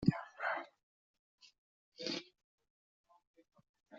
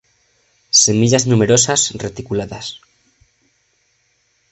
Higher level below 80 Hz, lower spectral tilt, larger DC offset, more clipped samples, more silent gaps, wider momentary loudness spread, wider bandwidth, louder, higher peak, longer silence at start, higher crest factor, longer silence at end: second, -72 dBFS vs -50 dBFS; about the same, -4.5 dB/octave vs -3.5 dB/octave; neither; neither; first, 0.83-1.38 s, 1.58-1.92 s, 2.44-2.58 s, 2.70-3.04 s, 3.27-3.34 s, 3.69-3.74 s vs none; about the same, 16 LU vs 16 LU; second, 7.4 kHz vs 8.8 kHz; second, -41 LUFS vs -14 LUFS; second, -16 dBFS vs 0 dBFS; second, 0 s vs 0.75 s; first, 28 dB vs 18 dB; second, 0 s vs 1.75 s